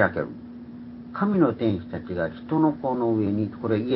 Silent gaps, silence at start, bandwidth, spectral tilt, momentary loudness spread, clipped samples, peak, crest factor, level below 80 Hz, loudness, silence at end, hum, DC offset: none; 0 s; 5.6 kHz; -12 dB/octave; 18 LU; under 0.1%; -6 dBFS; 18 dB; -52 dBFS; -25 LUFS; 0 s; none; under 0.1%